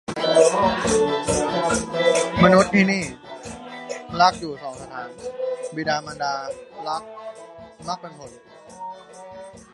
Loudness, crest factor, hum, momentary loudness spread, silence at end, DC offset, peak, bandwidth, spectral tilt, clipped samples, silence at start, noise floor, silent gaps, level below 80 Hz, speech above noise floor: -21 LUFS; 22 dB; none; 22 LU; 0.15 s; under 0.1%; 0 dBFS; 11.5 kHz; -4.5 dB/octave; under 0.1%; 0.1 s; -42 dBFS; none; -48 dBFS; 20 dB